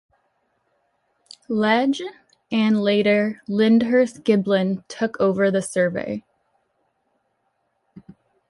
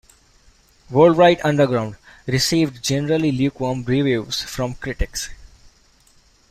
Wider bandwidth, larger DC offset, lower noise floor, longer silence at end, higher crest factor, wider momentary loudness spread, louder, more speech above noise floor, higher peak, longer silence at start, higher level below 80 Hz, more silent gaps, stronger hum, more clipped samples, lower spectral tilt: second, 11.5 kHz vs 15.5 kHz; neither; first, -71 dBFS vs -55 dBFS; first, 2.3 s vs 1.05 s; about the same, 18 dB vs 18 dB; about the same, 10 LU vs 12 LU; about the same, -20 LUFS vs -19 LUFS; first, 51 dB vs 36 dB; about the same, -4 dBFS vs -2 dBFS; first, 1.5 s vs 0.9 s; second, -64 dBFS vs -40 dBFS; neither; neither; neither; about the same, -6 dB/octave vs -5 dB/octave